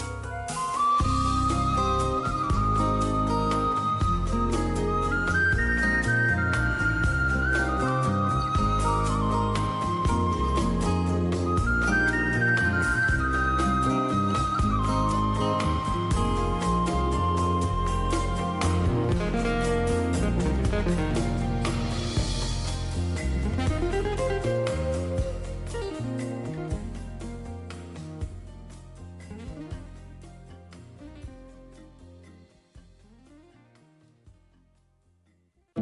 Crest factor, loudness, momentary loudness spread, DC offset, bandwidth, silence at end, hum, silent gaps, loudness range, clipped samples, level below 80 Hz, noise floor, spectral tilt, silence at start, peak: 14 dB; -26 LUFS; 16 LU; under 0.1%; 11.5 kHz; 0 s; none; none; 15 LU; under 0.1%; -32 dBFS; -67 dBFS; -6 dB/octave; 0 s; -12 dBFS